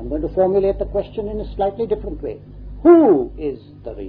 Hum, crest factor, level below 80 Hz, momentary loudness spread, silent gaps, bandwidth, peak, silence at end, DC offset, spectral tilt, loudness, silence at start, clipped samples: 50 Hz at -35 dBFS; 16 dB; -34 dBFS; 20 LU; none; 4.5 kHz; -2 dBFS; 0 s; under 0.1%; -12 dB/octave; -18 LUFS; 0 s; under 0.1%